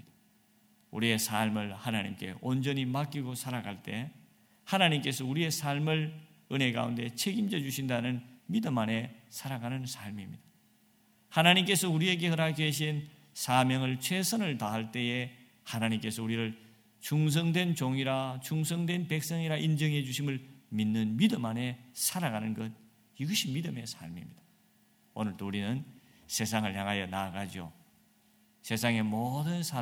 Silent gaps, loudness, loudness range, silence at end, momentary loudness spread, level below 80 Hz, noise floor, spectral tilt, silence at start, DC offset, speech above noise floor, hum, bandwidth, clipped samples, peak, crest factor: none; -32 LUFS; 7 LU; 0 s; 13 LU; -72 dBFS; -67 dBFS; -4.5 dB/octave; 0.9 s; under 0.1%; 35 dB; none; 18 kHz; under 0.1%; -8 dBFS; 24 dB